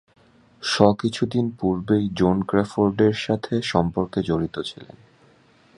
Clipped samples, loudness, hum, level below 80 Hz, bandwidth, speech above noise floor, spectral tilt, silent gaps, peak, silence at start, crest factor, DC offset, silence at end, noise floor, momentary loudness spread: under 0.1%; -22 LUFS; none; -48 dBFS; 11 kHz; 34 dB; -6.5 dB/octave; none; 0 dBFS; 0.6 s; 22 dB; under 0.1%; 0.9 s; -56 dBFS; 9 LU